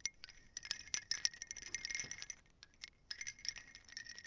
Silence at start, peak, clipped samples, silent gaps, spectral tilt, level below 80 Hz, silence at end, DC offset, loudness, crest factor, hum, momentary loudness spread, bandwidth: 0 s; -18 dBFS; under 0.1%; none; 1.5 dB/octave; -70 dBFS; 0 s; under 0.1%; -44 LUFS; 30 dB; none; 16 LU; 7.8 kHz